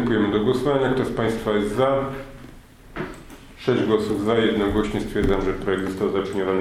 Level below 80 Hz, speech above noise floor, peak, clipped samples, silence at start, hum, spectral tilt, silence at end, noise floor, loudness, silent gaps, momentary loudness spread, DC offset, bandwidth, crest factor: -38 dBFS; 23 dB; -6 dBFS; under 0.1%; 0 s; none; -6.5 dB/octave; 0 s; -44 dBFS; -22 LUFS; none; 13 LU; under 0.1%; 15 kHz; 16 dB